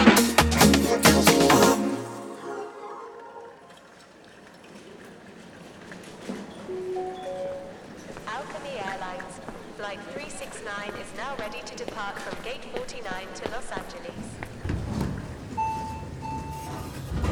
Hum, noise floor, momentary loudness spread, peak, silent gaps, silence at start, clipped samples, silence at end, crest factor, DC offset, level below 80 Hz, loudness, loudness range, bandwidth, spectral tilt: none; -50 dBFS; 24 LU; -2 dBFS; none; 0 s; under 0.1%; 0 s; 24 dB; under 0.1%; -42 dBFS; -26 LUFS; 19 LU; 20 kHz; -4 dB/octave